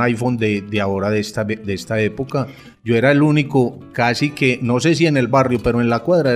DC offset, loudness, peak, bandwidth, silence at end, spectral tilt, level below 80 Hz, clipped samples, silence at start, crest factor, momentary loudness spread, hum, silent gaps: under 0.1%; -17 LUFS; -2 dBFS; 14 kHz; 0 s; -6.5 dB/octave; -44 dBFS; under 0.1%; 0 s; 14 dB; 8 LU; none; none